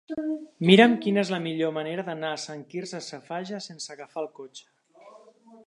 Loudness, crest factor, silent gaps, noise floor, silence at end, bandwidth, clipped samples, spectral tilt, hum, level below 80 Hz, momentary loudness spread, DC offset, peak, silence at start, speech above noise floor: -25 LUFS; 24 dB; none; -53 dBFS; 0.1 s; 11 kHz; under 0.1%; -5.5 dB/octave; none; -76 dBFS; 20 LU; under 0.1%; -2 dBFS; 0.1 s; 27 dB